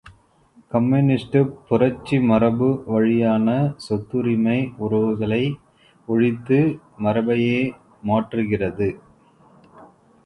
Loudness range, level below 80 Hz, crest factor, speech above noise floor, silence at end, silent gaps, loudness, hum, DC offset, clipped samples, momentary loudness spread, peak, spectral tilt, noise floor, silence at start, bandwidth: 3 LU; -52 dBFS; 18 dB; 35 dB; 0.4 s; none; -21 LUFS; none; under 0.1%; under 0.1%; 8 LU; -4 dBFS; -9 dB/octave; -55 dBFS; 0.05 s; 10.5 kHz